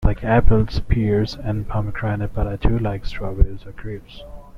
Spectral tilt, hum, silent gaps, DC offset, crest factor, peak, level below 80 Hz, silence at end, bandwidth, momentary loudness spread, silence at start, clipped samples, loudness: -8.5 dB/octave; none; none; under 0.1%; 18 dB; 0 dBFS; -24 dBFS; 0 s; 6.4 kHz; 16 LU; 0 s; under 0.1%; -22 LUFS